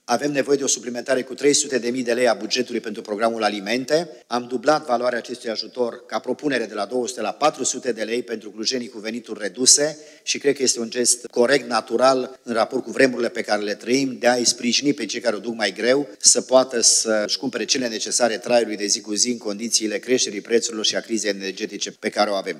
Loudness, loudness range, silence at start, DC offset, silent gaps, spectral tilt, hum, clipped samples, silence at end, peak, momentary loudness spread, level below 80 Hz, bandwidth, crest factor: -21 LUFS; 6 LU; 0.1 s; under 0.1%; none; -1.5 dB/octave; none; under 0.1%; 0 s; 0 dBFS; 11 LU; -86 dBFS; 15 kHz; 22 dB